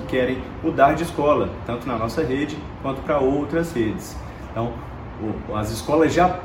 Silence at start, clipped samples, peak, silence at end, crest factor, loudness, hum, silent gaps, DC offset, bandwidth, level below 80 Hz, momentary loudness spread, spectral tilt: 0 s; under 0.1%; -2 dBFS; 0 s; 20 dB; -22 LUFS; none; none; under 0.1%; 16.5 kHz; -40 dBFS; 13 LU; -6.5 dB/octave